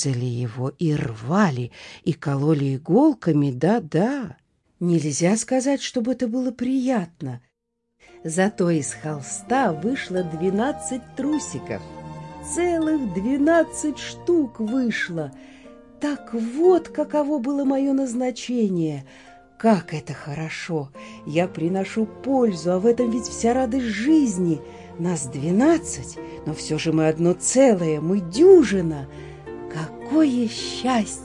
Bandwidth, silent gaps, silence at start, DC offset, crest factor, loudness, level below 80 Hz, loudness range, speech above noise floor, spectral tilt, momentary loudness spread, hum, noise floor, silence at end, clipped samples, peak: 11.5 kHz; none; 0 s; under 0.1%; 18 dB; -22 LUFS; -54 dBFS; 6 LU; 55 dB; -5.5 dB/octave; 14 LU; none; -76 dBFS; 0 s; under 0.1%; -4 dBFS